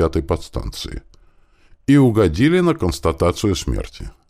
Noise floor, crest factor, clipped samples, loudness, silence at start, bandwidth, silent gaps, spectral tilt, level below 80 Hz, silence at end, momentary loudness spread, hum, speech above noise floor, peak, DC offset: -51 dBFS; 16 dB; under 0.1%; -18 LUFS; 0 s; 15.5 kHz; none; -6.5 dB/octave; -32 dBFS; 0.2 s; 16 LU; none; 34 dB; -2 dBFS; under 0.1%